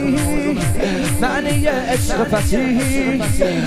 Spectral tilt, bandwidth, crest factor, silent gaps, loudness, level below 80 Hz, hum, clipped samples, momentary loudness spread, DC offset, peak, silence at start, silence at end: -5 dB/octave; 15.5 kHz; 14 dB; none; -18 LUFS; -28 dBFS; none; under 0.1%; 2 LU; under 0.1%; -2 dBFS; 0 s; 0 s